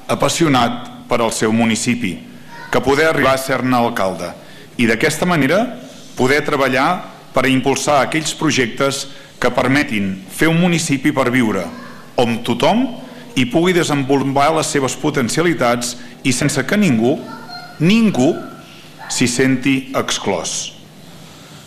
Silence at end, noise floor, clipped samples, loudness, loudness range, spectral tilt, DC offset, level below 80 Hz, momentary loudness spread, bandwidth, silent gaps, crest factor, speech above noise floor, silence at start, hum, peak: 0 s; -38 dBFS; under 0.1%; -16 LUFS; 1 LU; -4.5 dB/octave; under 0.1%; -44 dBFS; 13 LU; 15 kHz; none; 14 dB; 23 dB; 0 s; none; -2 dBFS